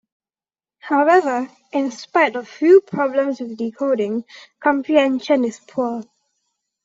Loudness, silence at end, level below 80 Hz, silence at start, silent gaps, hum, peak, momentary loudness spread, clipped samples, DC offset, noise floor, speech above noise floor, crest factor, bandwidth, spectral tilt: -19 LUFS; 0.8 s; -70 dBFS; 0.85 s; none; none; -2 dBFS; 12 LU; under 0.1%; under 0.1%; under -90 dBFS; over 72 dB; 18 dB; 7.8 kHz; -5 dB/octave